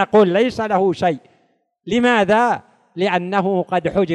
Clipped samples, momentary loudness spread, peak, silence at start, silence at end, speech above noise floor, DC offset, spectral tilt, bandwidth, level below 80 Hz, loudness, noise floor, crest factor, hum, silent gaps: under 0.1%; 8 LU; -2 dBFS; 0 s; 0 s; 45 dB; under 0.1%; -6 dB/octave; 10 kHz; -52 dBFS; -17 LUFS; -62 dBFS; 14 dB; none; none